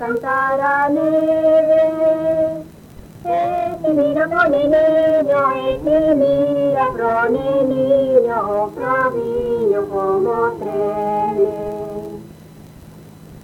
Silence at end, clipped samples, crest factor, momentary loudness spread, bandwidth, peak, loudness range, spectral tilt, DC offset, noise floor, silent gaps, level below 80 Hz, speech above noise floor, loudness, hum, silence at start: 0.05 s; under 0.1%; 14 dB; 7 LU; 15.5 kHz; -2 dBFS; 4 LU; -7.5 dB/octave; under 0.1%; -40 dBFS; none; -46 dBFS; 24 dB; -17 LUFS; none; 0 s